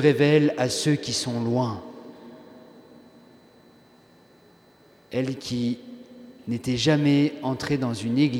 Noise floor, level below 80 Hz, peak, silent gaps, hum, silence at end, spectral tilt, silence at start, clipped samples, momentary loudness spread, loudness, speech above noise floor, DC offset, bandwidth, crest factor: -55 dBFS; -60 dBFS; -4 dBFS; none; none; 0 s; -5.5 dB/octave; 0 s; under 0.1%; 24 LU; -24 LUFS; 33 dB; under 0.1%; 14.5 kHz; 20 dB